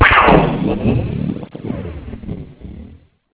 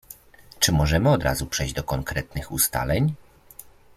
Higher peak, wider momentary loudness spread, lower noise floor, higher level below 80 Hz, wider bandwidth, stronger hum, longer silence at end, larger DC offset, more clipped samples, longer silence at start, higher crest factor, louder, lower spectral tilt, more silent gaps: first, 0 dBFS vs -4 dBFS; first, 24 LU vs 10 LU; second, -41 dBFS vs -49 dBFS; first, -28 dBFS vs -36 dBFS; second, 4 kHz vs 16 kHz; neither; about the same, 0.4 s vs 0.35 s; neither; neither; about the same, 0 s vs 0.1 s; about the same, 16 dB vs 20 dB; first, -16 LUFS vs -23 LUFS; first, -10 dB/octave vs -4 dB/octave; neither